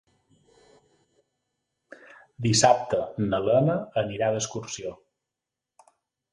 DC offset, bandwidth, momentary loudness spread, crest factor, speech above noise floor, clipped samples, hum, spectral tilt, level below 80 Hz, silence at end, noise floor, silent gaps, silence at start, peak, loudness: under 0.1%; 11.5 kHz; 14 LU; 24 dB; 63 dB; under 0.1%; none; -4.5 dB/octave; -58 dBFS; 1.35 s; -87 dBFS; none; 2.4 s; -4 dBFS; -25 LUFS